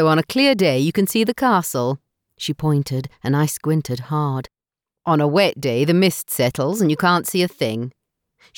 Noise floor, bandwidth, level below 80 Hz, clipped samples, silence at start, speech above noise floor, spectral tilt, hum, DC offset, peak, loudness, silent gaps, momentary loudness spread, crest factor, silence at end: -87 dBFS; 19.5 kHz; -56 dBFS; under 0.1%; 0 s; 69 dB; -5.5 dB/octave; none; under 0.1%; -4 dBFS; -19 LUFS; none; 10 LU; 16 dB; 0.65 s